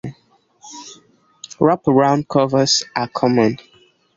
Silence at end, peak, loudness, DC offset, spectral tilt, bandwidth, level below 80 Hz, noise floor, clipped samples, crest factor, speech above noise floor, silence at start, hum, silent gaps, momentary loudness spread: 0.6 s; -2 dBFS; -16 LUFS; under 0.1%; -4.5 dB/octave; 7.8 kHz; -56 dBFS; -57 dBFS; under 0.1%; 16 dB; 41 dB; 0.05 s; none; none; 21 LU